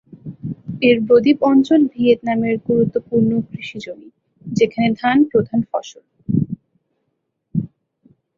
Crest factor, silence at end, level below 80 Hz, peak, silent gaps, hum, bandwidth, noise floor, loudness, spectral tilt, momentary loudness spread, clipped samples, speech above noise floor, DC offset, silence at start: 16 dB; 0.7 s; -54 dBFS; -2 dBFS; none; none; 7.4 kHz; -72 dBFS; -17 LUFS; -7.5 dB/octave; 19 LU; under 0.1%; 56 dB; under 0.1%; 0.25 s